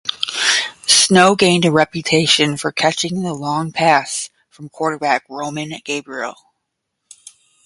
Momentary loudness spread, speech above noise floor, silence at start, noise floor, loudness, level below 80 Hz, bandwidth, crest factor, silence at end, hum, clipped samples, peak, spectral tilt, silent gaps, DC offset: 14 LU; 58 dB; 0.05 s; -75 dBFS; -15 LUFS; -58 dBFS; 11.5 kHz; 18 dB; 1.35 s; none; under 0.1%; 0 dBFS; -3 dB/octave; none; under 0.1%